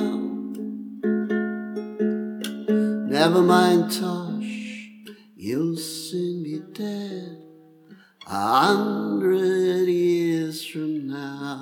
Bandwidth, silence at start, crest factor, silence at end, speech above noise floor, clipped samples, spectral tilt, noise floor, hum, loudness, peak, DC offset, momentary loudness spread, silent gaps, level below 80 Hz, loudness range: 18 kHz; 0 s; 20 dB; 0 s; 32 dB; under 0.1%; -5.5 dB/octave; -51 dBFS; none; -24 LUFS; -2 dBFS; under 0.1%; 14 LU; none; -76 dBFS; 9 LU